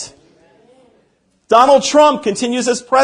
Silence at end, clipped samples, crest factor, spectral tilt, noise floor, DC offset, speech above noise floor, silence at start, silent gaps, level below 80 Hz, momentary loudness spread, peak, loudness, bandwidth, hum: 0 s; 0.1%; 14 dB; -3 dB/octave; -59 dBFS; under 0.1%; 47 dB; 0 s; none; -58 dBFS; 9 LU; 0 dBFS; -12 LUFS; 10.5 kHz; none